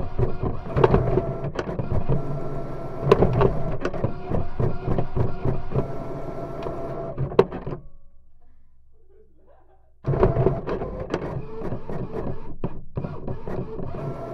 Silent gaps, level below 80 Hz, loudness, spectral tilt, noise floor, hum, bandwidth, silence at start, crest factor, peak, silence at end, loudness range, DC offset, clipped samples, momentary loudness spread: none; -32 dBFS; -26 LUFS; -9 dB/octave; -51 dBFS; none; 6.4 kHz; 0 s; 22 dB; -2 dBFS; 0 s; 6 LU; under 0.1%; under 0.1%; 13 LU